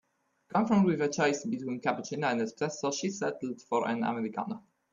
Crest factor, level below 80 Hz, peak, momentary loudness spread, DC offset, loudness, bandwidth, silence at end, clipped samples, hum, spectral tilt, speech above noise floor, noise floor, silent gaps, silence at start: 18 dB; -72 dBFS; -14 dBFS; 9 LU; under 0.1%; -31 LUFS; 7.4 kHz; 0.3 s; under 0.1%; none; -5 dB/octave; 34 dB; -64 dBFS; none; 0.55 s